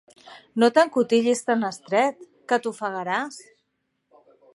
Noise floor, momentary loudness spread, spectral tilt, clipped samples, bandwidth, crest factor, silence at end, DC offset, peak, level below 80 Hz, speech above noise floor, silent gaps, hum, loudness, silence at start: -75 dBFS; 14 LU; -4 dB/octave; under 0.1%; 11.5 kHz; 20 dB; 1.15 s; under 0.1%; -4 dBFS; -80 dBFS; 53 dB; none; none; -23 LUFS; 0.3 s